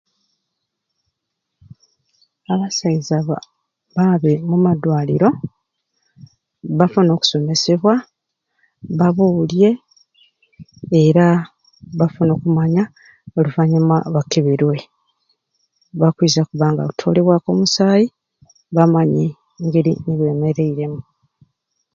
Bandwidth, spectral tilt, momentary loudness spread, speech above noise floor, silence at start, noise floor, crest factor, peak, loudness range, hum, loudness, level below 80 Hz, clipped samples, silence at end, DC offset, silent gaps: 7.4 kHz; -6.5 dB/octave; 12 LU; 62 dB; 2.5 s; -78 dBFS; 18 dB; 0 dBFS; 3 LU; none; -16 LUFS; -56 dBFS; under 0.1%; 0.95 s; under 0.1%; none